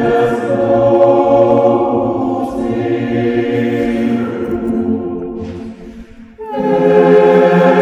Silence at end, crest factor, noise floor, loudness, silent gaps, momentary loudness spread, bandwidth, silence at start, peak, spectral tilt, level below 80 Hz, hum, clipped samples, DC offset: 0 s; 12 dB; -34 dBFS; -13 LUFS; none; 15 LU; 9 kHz; 0 s; 0 dBFS; -8 dB/octave; -42 dBFS; none; under 0.1%; under 0.1%